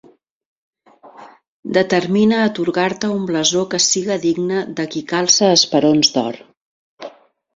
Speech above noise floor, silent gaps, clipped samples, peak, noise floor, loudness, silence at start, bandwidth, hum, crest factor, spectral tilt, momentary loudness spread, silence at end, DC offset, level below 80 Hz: 27 dB; 1.48-1.63 s, 6.57-6.97 s; under 0.1%; 0 dBFS; -43 dBFS; -16 LUFS; 1.05 s; 8 kHz; none; 18 dB; -3 dB/octave; 18 LU; 0.45 s; under 0.1%; -60 dBFS